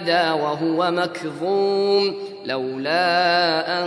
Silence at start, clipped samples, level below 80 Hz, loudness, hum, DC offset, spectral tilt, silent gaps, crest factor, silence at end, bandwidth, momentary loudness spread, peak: 0 s; under 0.1%; -74 dBFS; -20 LUFS; none; under 0.1%; -5 dB/octave; none; 16 dB; 0 s; 11 kHz; 9 LU; -4 dBFS